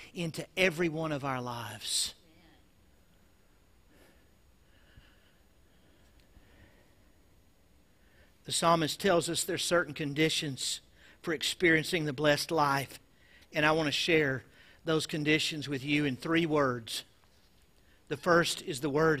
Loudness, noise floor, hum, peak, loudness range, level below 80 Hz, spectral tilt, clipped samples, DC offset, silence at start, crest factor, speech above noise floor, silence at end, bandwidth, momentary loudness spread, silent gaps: -30 LUFS; -65 dBFS; none; -10 dBFS; 8 LU; -62 dBFS; -4 dB/octave; under 0.1%; under 0.1%; 0 s; 22 dB; 35 dB; 0 s; 15.5 kHz; 11 LU; none